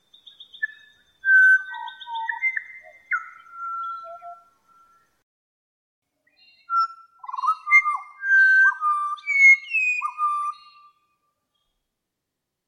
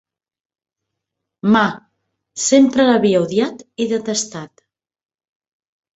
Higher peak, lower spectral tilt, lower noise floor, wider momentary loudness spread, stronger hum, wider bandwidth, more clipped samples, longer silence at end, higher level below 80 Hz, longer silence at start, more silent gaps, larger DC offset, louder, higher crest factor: second, -6 dBFS vs -2 dBFS; second, 3 dB/octave vs -4 dB/octave; about the same, -82 dBFS vs -80 dBFS; first, 21 LU vs 15 LU; neither; first, 11.5 kHz vs 8.2 kHz; neither; first, 2.15 s vs 1.5 s; second, -84 dBFS vs -60 dBFS; second, 0.6 s vs 1.45 s; first, 5.23-6.02 s vs none; neither; second, -19 LUFS vs -16 LUFS; about the same, 18 dB vs 18 dB